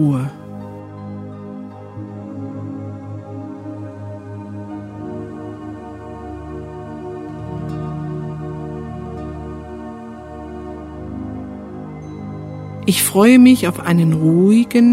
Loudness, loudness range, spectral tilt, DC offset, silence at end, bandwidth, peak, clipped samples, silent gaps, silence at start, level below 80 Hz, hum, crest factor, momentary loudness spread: -17 LUFS; 16 LU; -6 dB/octave; under 0.1%; 0 s; 16 kHz; 0 dBFS; under 0.1%; none; 0 s; -44 dBFS; none; 20 dB; 20 LU